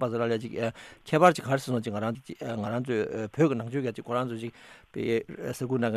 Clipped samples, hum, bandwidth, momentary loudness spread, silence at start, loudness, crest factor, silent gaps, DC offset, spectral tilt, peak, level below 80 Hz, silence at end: under 0.1%; none; 14.5 kHz; 15 LU; 0 s; -29 LUFS; 22 dB; none; under 0.1%; -6.5 dB/octave; -6 dBFS; -66 dBFS; 0 s